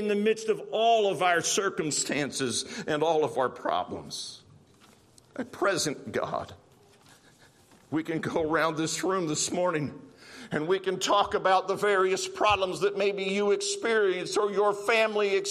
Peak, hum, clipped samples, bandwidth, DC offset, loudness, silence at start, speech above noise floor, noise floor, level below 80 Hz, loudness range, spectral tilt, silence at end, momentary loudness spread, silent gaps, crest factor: -10 dBFS; none; under 0.1%; 14 kHz; under 0.1%; -27 LUFS; 0 s; 31 dB; -58 dBFS; -66 dBFS; 8 LU; -3 dB/octave; 0 s; 11 LU; none; 18 dB